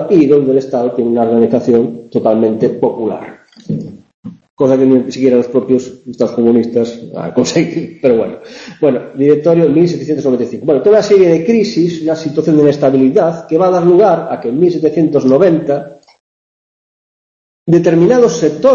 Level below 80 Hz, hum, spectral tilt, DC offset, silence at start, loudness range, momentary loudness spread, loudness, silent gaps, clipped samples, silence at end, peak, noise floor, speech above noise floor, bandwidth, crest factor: -52 dBFS; none; -7 dB/octave; under 0.1%; 0 s; 4 LU; 10 LU; -12 LUFS; 4.14-4.23 s, 4.50-4.57 s, 16.20-17.66 s; under 0.1%; 0 s; 0 dBFS; under -90 dBFS; over 79 dB; 7.6 kHz; 12 dB